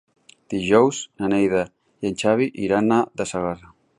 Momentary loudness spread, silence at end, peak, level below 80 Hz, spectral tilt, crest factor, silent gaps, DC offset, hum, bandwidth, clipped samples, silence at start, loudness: 12 LU; 0.4 s; -2 dBFS; -54 dBFS; -5.5 dB/octave; 18 dB; none; under 0.1%; none; 11.5 kHz; under 0.1%; 0.5 s; -21 LUFS